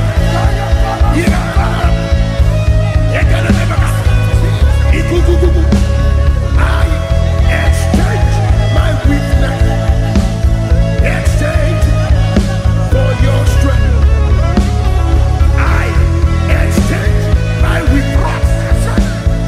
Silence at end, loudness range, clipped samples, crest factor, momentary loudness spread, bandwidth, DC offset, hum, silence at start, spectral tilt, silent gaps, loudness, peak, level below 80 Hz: 0 s; 1 LU; under 0.1%; 8 dB; 2 LU; 13 kHz; under 0.1%; none; 0 s; -6.5 dB/octave; none; -12 LUFS; 0 dBFS; -12 dBFS